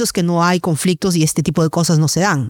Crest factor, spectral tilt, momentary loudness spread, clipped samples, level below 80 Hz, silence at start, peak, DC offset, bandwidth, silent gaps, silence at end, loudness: 14 dB; -5 dB/octave; 2 LU; under 0.1%; -48 dBFS; 0 s; -2 dBFS; under 0.1%; 18.5 kHz; none; 0 s; -15 LUFS